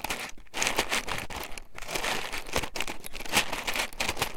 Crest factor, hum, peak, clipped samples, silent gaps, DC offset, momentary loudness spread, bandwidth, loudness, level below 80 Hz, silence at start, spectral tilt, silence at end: 24 dB; none; -6 dBFS; under 0.1%; none; under 0.1%; 11 LU; 17 kHz; -30 LUFS; -44 dBFS; 0 s; -1.5 dB/octave; 0 s